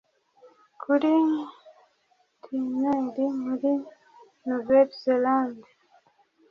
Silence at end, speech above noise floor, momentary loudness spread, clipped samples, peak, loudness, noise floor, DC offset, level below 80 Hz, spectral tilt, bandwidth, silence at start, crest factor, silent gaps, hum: 0.9 s; 44 dB; 17 LU; under 0.1%; -8 dBFS; -25 LUFS; -68 dBFS; under 0.1%; -72 dBFS; -7 dB/octave; 6.6 kHz; 0.8 s; 18 dB; none; none